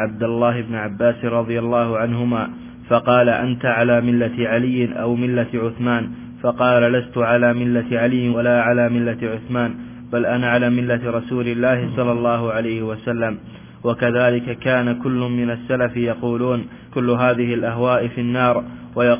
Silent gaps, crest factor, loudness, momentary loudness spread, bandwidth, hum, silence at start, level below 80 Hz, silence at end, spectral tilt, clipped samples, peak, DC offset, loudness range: none; 16 dB; -19 LUFS; 8 LU; 3.6 kHz; none; 0 s; -50 dBFS; 0 s; -11 dB/octave; under 0.1%; -2 dBFS; under 0.1%; 3 LU